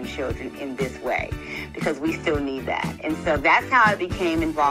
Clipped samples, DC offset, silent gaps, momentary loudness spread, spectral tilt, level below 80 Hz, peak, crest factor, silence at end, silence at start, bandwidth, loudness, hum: under 0.1%; under 0.1%; none; 13 LU; -5.5 dB/octave; -42 dBFS; -4 dBFS; 18 dB; 0 s; 0 s; 16 kHz; -23 LUFS; none